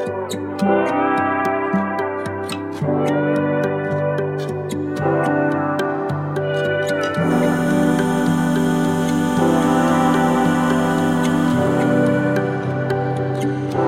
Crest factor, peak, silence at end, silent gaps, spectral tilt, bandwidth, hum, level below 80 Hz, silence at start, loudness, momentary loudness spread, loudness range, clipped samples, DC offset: 14 dB; -4 dBFS; 0 s; none; -6.5 dB/octave; 15.5 kHz; none; -48 dBFS; 0 s; -19 LUFS; 7 LU; 4 LU; under 0.1%; under 0.1%